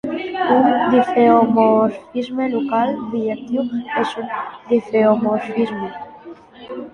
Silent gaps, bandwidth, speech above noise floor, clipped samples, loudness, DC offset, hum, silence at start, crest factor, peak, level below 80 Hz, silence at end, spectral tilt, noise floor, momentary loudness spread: none; 9.6 kHz; 22 dB; under 0.1%; -18 LUFS; under 0.1%; none; 0.05 s; 16 dB; -2 dBFS; -60 dBFS; 0.05 s; -7 dB/octave; -39 dBFS; 14 LU